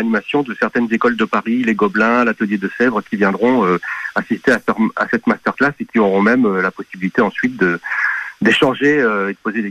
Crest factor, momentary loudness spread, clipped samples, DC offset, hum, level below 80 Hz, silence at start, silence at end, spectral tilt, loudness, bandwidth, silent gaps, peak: 14 dB; 6 LU; under 0.1%; under 0.1%; none; -56 dBFS; 0 s; 0 s; -6 dB/octave; -16 LUFS; 11 kHz; none; -2 dBFS